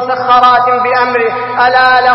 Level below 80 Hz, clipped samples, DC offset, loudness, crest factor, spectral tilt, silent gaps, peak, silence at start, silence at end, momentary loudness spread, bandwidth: -48 dBFS; 0.3%; under 0.1%; -9 LUFS; 8 dB; -5 dB/octave; none; 0 dBFS; 0 s; 0 s; 5 LU; 5.8 kHz